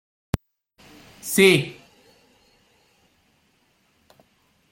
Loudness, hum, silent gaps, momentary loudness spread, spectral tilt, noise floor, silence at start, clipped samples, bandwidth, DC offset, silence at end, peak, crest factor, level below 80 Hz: -20 LUFS; none; none; 19 LU; -4 dB/octave; -65 dBFS; 0.35 s; under 0.1%; 16.5 kHz; under 0.1%; 3 s; -2 dBFS; 24 dB; -50 dBFS